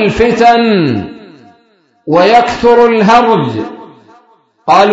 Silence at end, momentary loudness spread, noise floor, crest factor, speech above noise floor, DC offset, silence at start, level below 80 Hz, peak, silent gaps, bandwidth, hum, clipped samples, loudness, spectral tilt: 0 s; 15 LU; -52 dBFS; 10 dB; 44 dB; under 0.1%; 0 s; -38 dBFS; 0 dBFS; none; 7.8 kHz; none; 0.5%; -9 LUFS; -6 dB/octave